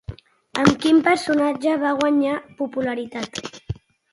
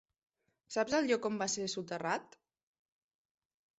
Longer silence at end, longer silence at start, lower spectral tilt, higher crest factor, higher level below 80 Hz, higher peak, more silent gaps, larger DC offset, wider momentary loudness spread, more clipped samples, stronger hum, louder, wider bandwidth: second, 0.4 s vs 1.55 s; second, 0.1 s vs 0.7 s; first, -5.5 dB/octave vs -3 dB/octave; about the same, 20 dB vs 20 dB; first, -48 dBFS vs -76 dBFS; first, 0 dBFS vs -20 dBFS; neither; neither; first, 17 LU vs 7 LU; neither; neither; first, -20 LUFS vs -35 LUFS; first, 11.5 kHz vs 8.2 kHz